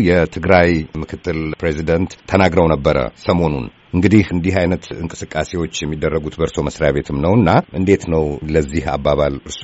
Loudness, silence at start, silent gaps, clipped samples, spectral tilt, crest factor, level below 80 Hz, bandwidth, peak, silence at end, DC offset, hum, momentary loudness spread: -17 LUFS; 0 s; none; under 0.1%; -6 dB/octave; 16 dB; -32 dBFS; 8 kHz; 0 dBFS; 0 s; under 0.1%; none; 9 LU